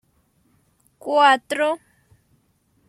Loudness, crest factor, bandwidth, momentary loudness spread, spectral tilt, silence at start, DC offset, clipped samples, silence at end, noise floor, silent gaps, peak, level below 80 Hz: -19 LUFS; 20 dB; 14 kHz; 16 LU; -2 dB/octave; 1.05 s; under 0.1%; under 0.1%; 1.15 s; -64 dBFS; none; -4 dBFS; -72 dBFS